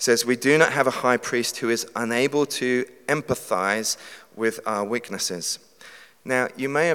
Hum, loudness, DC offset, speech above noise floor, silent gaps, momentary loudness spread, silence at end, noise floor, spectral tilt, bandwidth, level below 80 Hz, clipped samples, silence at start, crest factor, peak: none; -23 LUFS; under 0.1%; 25 dB; none; 8 LU; 0 s; -48 dBFS; -3 dB/octave; 18 kHz; -66 dBFS; under 0.1%; 0 s; 22 dB; 0 dBFS